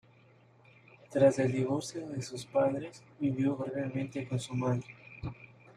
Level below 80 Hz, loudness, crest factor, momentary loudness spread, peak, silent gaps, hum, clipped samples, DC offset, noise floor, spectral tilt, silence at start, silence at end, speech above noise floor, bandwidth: -64 dBFS; -32 LUFS; 20 dB; 17 LU; -12 dBFS; none; none; under 0.1%; under 0.1%; -61 dBFS; -6.5 dB/octave; 1.1 s; 0.05 s; 30 dB; 11.5 kHz